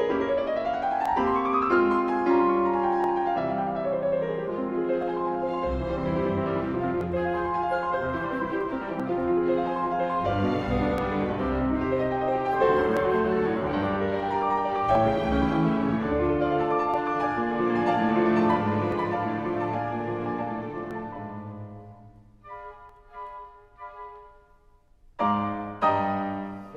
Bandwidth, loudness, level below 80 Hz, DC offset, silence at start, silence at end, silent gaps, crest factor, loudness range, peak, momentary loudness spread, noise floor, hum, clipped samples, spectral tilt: 7.4 kHz; -26 LUFS; -46 dBFS; under 0.1%; 0 s; 0 s; none; 16 dB; 11 LU; -10 dBFS; 13 LU; -58 dBFS; none; under 0.1%; -8.5 dB/octave